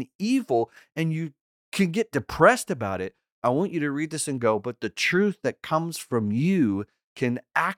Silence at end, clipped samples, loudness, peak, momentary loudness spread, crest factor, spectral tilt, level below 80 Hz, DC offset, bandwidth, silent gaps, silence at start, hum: 0.05 s; under 0.1%; -25 LUFS; -4 dBFS; 11 LU; 22 dB; -5.5 dB/octave; -58 dBFS; under 0.1%; 16.5 kHz; 0.15-0.19 s, 1.41-1.72 s, 3.32-3.42 s, 7.04-7.16 s; 0 s; none